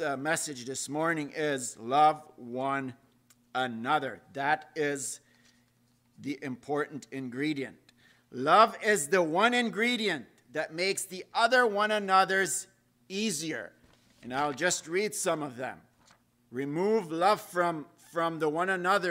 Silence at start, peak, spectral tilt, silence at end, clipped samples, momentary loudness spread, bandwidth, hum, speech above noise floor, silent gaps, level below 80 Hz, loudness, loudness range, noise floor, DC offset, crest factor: 0 s; -8 dBFS; -3 dB/octave; 0 s; under 0.1%; 15 LU; 16 kHz; none; 39 dB; none; -78 dBFS; -29 LUFS; 7 LU; -68 dBFS; under 0.1%; 22 dB